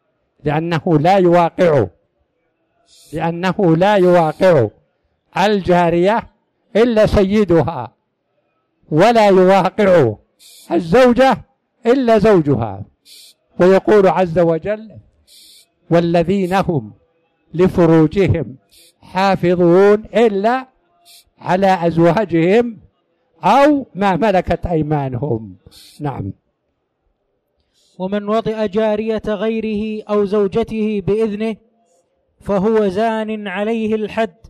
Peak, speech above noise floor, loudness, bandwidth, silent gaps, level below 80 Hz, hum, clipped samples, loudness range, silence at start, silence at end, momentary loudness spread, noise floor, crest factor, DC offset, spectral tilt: -4 dBFS; 55 dB; -15 LUFS; 13.5 kHz; none; -40 dBFS; none; under 0.1%; 6 LU; 0.45 s; 0.2 s; 13 LU; -69 dBFS; 10 dB; under 0.1%; -7.5 dB/octave